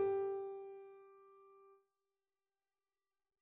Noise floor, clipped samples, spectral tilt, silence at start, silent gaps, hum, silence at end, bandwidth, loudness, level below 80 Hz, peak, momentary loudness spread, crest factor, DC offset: under -90 dBFS; under 0.1%; -2.5 dB/octave; 0 s; none; none; 1.7 s; 3.7 kHz; -43 LUFS; -86 dBFS; -28 dBFS; 25 LU; 18 dB; under 0.1%